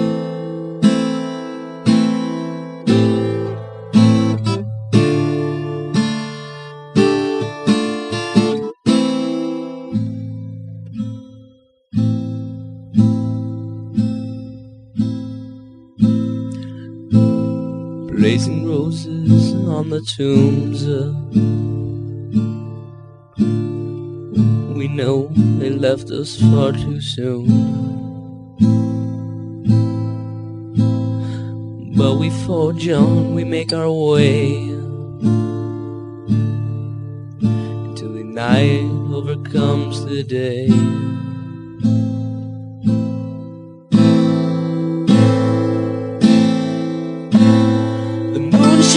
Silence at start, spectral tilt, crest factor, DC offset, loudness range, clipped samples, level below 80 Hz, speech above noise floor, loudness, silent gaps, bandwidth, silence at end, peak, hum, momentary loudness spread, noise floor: 0 s; -7 dB/octave; 16 dB; under 0.1%; 6 LU; under 0.1%; -52 dBFS; 34 dB; -18 LUFS; none; 10.5 kHz; 0 s; 0 dBFS; none; 15 LU; -49 dBFS